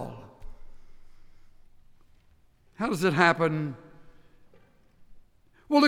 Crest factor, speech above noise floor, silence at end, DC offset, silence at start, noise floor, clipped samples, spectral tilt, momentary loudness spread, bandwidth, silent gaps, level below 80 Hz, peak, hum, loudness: 24 dB; 35 dB; 0 s; under 0.1%; 0 s; -60 dBFS; under 0.1%; -5.5 dB/octave; 25 LU; 16 kHz; none; -52 dBFS; -6 dBFS; none; -26 LUFS